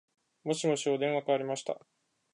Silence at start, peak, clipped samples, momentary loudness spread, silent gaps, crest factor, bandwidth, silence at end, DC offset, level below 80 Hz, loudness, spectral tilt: 0.45 s; -16 dBFS; under 0.1%; 11 LU; none; 18 dB; 11 kHz; 0.55 s; under 0.1%; -86 dBFS; -32 LUFS; -4.5 dB/octave